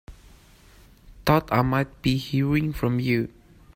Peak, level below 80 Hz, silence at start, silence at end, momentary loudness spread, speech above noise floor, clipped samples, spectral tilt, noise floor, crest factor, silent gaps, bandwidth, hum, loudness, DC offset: -6 dBFS; -44 dBFS; 0.1 s; 0.45 s; 5 LU; 29 dB; under 0.1%; -7 dB/octave; -52 dBFS; 20 dB; none; 16 kHz; none; -24 LUFS; under 0.1%